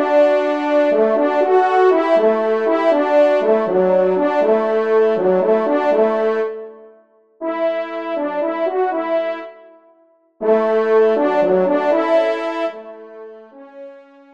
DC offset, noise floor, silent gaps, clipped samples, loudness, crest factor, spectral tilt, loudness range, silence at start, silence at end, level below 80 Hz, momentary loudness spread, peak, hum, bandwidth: 0.3%; -55 dBFS; none; under 0.1%; -16 LUFS; 14 dB; -7 dB/octave; 7 LU; 0 s; 0.35 s; -70 dBFS; 11 LU; -4 dBFS; none; 7.4 kHz